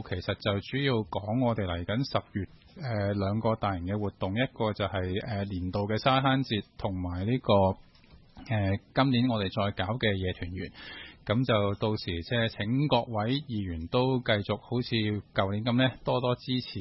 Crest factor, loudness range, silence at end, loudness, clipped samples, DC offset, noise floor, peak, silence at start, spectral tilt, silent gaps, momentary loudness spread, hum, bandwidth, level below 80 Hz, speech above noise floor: 18 dB; 2 LU; 0 s; -29 LUFS; under 0.1%; under 0.1%; -55 dBFS; -10 dBFS; 0 s; -8.5 dB/octave; none; 8 LU; none; 6 kHz; -56 dBFS; 26 dB